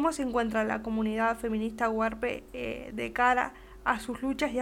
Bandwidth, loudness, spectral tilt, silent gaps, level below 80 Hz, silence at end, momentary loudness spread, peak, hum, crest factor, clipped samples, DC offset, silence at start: 16 kHz; -30 LUFS; -5 dB/octave; none; -52 dBFS; 0 s; 10 LU; -10 dBFS; none; 20 dB; under 0.1%; under 0.1%; 0 s